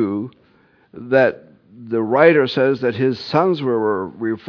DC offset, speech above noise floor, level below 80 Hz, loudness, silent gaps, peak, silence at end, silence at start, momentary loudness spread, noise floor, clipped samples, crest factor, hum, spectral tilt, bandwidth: under 0.1%; 38 dB; -64 dBFS; -18 LUFS; none; 0 dBFS; 0 s; 0 s; 12 LU; -55 dBFS; under 0.1%; 18 dB; none; -8 dB/octave; 5.4 kHz